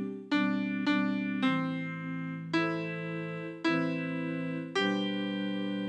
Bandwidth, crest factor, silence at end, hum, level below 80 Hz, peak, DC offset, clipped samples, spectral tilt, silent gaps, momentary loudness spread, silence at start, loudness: 9 kHz; 14 dB; 0 s; none; -86 dBFS; -16 dBFS; under 0.1%; under 0.1%; -6.5 dB/octave; none; 7 LU; 0 s; -32 LUFS